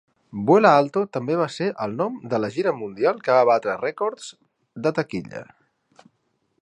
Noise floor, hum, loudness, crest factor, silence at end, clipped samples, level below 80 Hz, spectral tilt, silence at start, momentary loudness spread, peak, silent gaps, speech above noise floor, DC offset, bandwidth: -71 dBFS; none; -22 LUFS; 22 dB; 1.2 s; under 0.1%; -66 dBFS; -6.5 dB/octave; 0.35 s; 16 LU; -2 dBFS; none; 49 dB; under 0.1%; 10.5 kHz